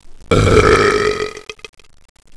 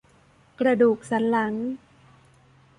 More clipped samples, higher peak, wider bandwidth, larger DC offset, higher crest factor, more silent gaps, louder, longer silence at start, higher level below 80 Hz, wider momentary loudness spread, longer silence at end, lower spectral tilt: neither; first, 0 dBFS vs -8 dBFS; about the same, 11 kHz vs 11 kHz; neither; about the same, 16 dB vs 18 dB; neither; first, -13 LUFS vs -23 LUFS; second, 0.05 s vs 0.6 s; first, -28 dBFS vs -66 dBFS; first, 19 LU vs 12 LU; second, 0.85 s vs 1 s; second, -5 dB/octave vs -6.5 dB/octave